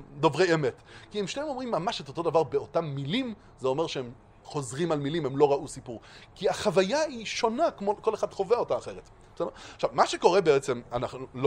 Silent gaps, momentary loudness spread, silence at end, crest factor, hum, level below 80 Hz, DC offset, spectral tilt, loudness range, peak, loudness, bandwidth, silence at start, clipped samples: none; 13 LU; 0 s; 22 dB; none; -58 dBFS; under 0.1%; -5 dB/octave; 3 LU; -6 dBFS; -28 LUFS; 11.5 kHz; 0 s; under 0.1%